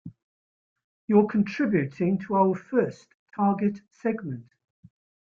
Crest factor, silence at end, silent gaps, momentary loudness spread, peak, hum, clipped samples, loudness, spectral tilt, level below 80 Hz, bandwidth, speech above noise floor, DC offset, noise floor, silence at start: 18 dB; 0.85 s; 0.22-0.76 s, 0.84-1.08 s, 3.14-3.26 s; 13 LU; -8 dBFS; none; under 0.1%; -25 LUFS; -9 dB/octave; -68 dBFS; 6.8 kHz; over 65 dB; under 0.1%; under -90 dBFS; 0.05 s